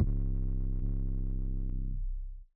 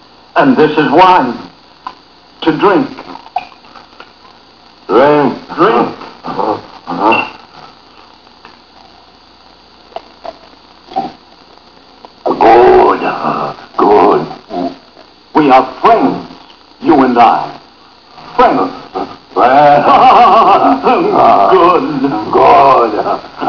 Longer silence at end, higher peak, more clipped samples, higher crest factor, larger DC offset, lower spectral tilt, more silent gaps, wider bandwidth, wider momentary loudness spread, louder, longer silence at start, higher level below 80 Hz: about the same, 0.1 s vs 0 s; second, -16 dBFS vs 0 dBFS; second, under 0.1% vs 1%; first, 16 dB vs 10 dB; second, under 0.1% vs 0.3%; first, -15 dB/octave vs -7 dB/octave; neither; second, 1.1 kHz vs 5.4 kHz; second, 6 LU vs 19 LU; second, -38 LUFS vs -9 LUFS; second, 0 s vs 0.35 s; first, -32 dBFS vs -46 dBFS